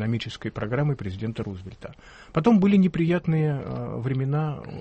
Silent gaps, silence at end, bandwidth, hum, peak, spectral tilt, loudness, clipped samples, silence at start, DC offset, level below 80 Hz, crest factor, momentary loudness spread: none; 0 s; 8.4 kHz; none; -6 dBFS; -8.5 dB/octave; -25 LUFS; under 0.1%; 0 s; under 0.1%; -50 dBFS; 18 dB; 15 LU